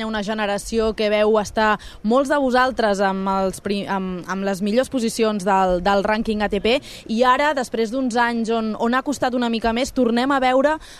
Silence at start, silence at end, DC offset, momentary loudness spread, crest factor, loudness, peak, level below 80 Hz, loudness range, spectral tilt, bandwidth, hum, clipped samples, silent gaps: 0 s; 0 s; under 0.1%; 6 LU; 16 dB; -20 LUFS; -4 dBFS; -44 dBFS; 1 LU; -4.5 dB/octave; 14 kHz; none; under 0.1%; none